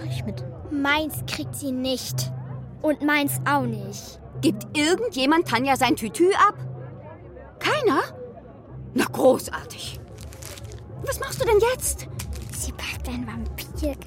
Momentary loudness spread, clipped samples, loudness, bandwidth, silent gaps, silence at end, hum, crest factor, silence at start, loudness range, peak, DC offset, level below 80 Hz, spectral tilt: 19 LU; under 0.1%; -24 LUFS; 16.5 kHz; none; 0 s; none; 18 dB; 0 s; 5 LU; -6 dBFS; under 0.1%; -42 dBFS; -4.5 dB/octave